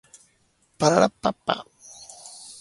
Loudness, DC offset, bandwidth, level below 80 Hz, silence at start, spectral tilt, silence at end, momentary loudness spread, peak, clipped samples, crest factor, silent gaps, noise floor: -23 LUFS; under 0.1%; 11.5 kHz; -60 dBFS; 0.8 s; -4.5 dB/octave; 0.1 s; 23 LU; -2 dBFS; under 0.1%; 24 dB; none; -65 dBFS